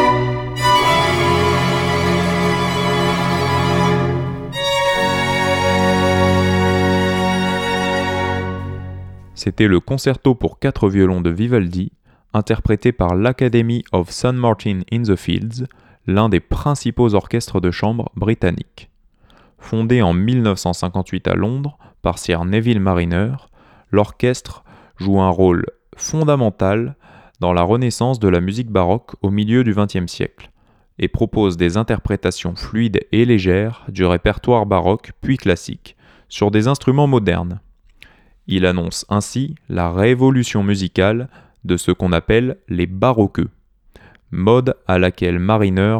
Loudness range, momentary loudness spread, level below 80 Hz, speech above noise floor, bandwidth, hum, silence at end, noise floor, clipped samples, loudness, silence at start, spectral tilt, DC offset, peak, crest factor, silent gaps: 3 LU; 9 LU; -36 dBFS; 35 dB; 16.5 kHz; none; 0 s; -51 dBFS; under 0.1%; -17 LUFS; 0 s; -6 dB/octave; under 0.1%; 0 dBFS; 16 dB; none